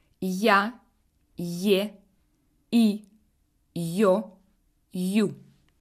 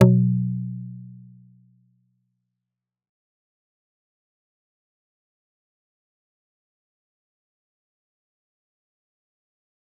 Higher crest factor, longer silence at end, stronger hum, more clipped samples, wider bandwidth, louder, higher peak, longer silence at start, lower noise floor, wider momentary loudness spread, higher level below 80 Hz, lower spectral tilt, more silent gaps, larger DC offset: second, 20 dB vs 26 dB; second, 0.4 s vs 8.9 s; neither; neither; first, 15.5 kHz vs 3.6 kHz; about the same, -25 LUFS vs -23 LUFS; second, -6 dBFS vs -2 dBFS; first, 0.2 s vs 0 s; second, -68 dBFS vs -86 dBFS; second, 16 LU vs 23 LU; about the same, -68 dBFS vs -66 dBFS; second, -5.5 dB/octave vs -10 dB/octave; neither; neither